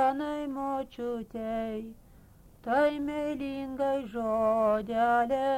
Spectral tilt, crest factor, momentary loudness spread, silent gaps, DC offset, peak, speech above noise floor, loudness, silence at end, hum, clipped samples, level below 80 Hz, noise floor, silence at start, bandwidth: -6 dB/octave; 14 dB; 10 LU; none; under 0.1%; -14 dBFS; 26 dB; -30 LUFS; 0 s; none; under 0.1%; -56 dBFS; -55 dBFS; 0 s; 16 kHz